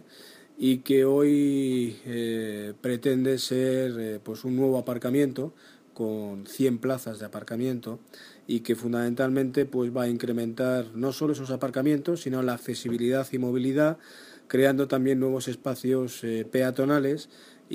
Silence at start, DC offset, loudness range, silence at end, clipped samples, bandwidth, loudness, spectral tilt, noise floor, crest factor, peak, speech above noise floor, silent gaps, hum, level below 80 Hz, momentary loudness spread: 0.15 s; under 0.1%; 4 LU; 0 s; under 0.1%; 15.5 kHz; -27 LUFS; -6 dB/octave; -51 dBFS; 18 dB; -8 dBFS; 24 dB; none; none; -72 dBFS; 11 LU